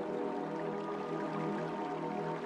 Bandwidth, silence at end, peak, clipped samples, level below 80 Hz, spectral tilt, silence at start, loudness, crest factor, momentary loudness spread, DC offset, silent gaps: 11 kHz; 0 s; -24 dBFS; under 0.1%; -76 dBFS; -7.5 dB/octave; 0 s; -38 LUFS; 12 dB; 2 LU; under 0.1%; none